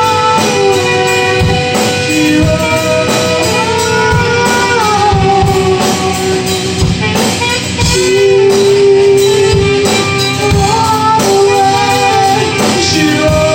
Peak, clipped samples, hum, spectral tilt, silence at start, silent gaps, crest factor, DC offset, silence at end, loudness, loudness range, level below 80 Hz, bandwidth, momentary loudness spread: 0 dBFS; under 0.1%; none; -4 dB/octave; 0 s; none; 10 dB; under 0.1%; 0 s; -9 LUFS; 2 LU; -30 dBFS; 16.5 kHz; 4 LU